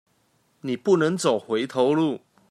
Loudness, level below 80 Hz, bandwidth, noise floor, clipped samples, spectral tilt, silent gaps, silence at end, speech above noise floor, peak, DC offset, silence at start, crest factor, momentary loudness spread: -23 LUFS; -72 dBFS; 13.5 kHz; -66 dBFS; under 0.1%; -5.5 dB/octave; none; 0.35 s; 44 dB; -8 dBFS; under 0.1%; 0.65 s; 16 dB; 12 LU